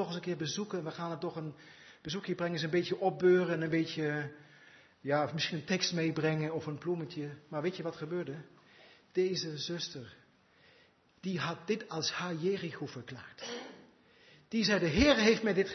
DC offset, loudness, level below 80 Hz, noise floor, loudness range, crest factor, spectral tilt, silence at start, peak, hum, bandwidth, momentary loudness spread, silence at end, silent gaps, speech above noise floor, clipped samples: under 0.1%; -33 LUFS; -58 dBFS; -66 dBFS; 6 LU; 22 dB; -4 dB/octave; 0 s; -12 dBFS; none; 6.2 kHz; 17 LU; 0 s; none; 32 dB; under 0.1%